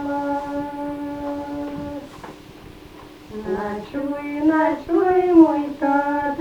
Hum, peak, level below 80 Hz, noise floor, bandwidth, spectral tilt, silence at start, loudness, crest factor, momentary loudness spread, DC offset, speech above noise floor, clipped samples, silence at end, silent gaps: none; -2 dBFS; -50 dBFS; -42 dBFS; 7.8 kHz; -7 dB/octave; 0 s; -21 LUFS; 20 dB; 26 LU; under 0.1%; 24 dB; under 0.1%; 0 s; none